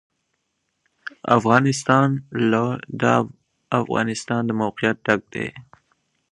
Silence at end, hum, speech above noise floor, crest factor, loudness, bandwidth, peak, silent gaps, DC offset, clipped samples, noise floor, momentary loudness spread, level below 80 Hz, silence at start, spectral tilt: 0.7 s; none; 54 dB; 22 dB; -21 LUFS; 11 kHz; 0 dBFS; none; under 0.1%; under 0.1%; -74 dBFS; 13 LU; -60 dBFS; 1.25 s; -6 dB/octave